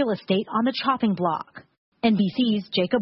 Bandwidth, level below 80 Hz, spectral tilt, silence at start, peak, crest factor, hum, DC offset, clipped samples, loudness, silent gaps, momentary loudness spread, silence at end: 5.8 kHz; -64 dBFS; -10.5 dB/octave; 0 s; -6 dBFS; 18 dB; none; under 0.1%; under 0.1%; -24 LUFS; 1.78-1.92 s; 4 LU; 0 s